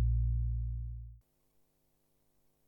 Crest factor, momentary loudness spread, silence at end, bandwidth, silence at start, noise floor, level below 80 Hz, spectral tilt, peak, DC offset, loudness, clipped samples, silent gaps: 14 dB; 16 LU; 1.5 s; 0.5 kHz; 0 s; -75 dBFS; -38 dBFS; -11 dB/octave; -22 dBFS; under 0.1%; -37 LUFS; under 0.1%; none